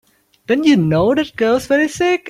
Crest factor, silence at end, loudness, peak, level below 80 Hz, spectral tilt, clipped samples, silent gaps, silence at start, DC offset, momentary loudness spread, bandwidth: 14 dB; 0 s; -15 LUFS; -2 dBFS; -48 dBFS; -6 dB/octave; under 0.1%; none; 0.5 s; under 0.1%; 4 LU; 15 kHz